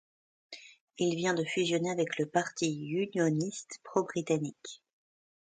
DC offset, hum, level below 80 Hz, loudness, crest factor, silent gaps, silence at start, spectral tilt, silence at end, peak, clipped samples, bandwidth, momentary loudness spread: under 0.1%; none; -76 dBFS; -32 LUFS; 22 dB; 0.81-0.87 s; 0.5 s; -5 dB/octave; 0.75 s; -12 dBFS; under 0.1%; 9.4 kHz; 19 LU